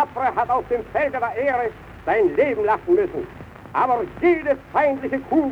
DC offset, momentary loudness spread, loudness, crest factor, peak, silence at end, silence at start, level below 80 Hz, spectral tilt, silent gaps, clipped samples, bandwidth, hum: under 0.1%; 9 LU; -21 LUFS; 14 dB; -6 dBFS; 0 s; 0 s; -50 dBFS; -7.5 dB/octave; none; under 0.1%; 6.2 kHz; none